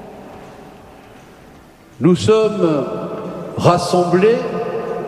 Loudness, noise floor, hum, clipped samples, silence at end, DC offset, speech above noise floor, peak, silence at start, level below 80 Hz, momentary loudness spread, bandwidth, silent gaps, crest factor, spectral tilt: -16 LUFS; -43 dBFS; none; under 0.1%; 0 s; under 0.1%; 29 dB; 0 dBFS; 0 s; -52 dBFS; 23 LU; 13.5 kHz; none; 18 dB; -6.5 dB/octave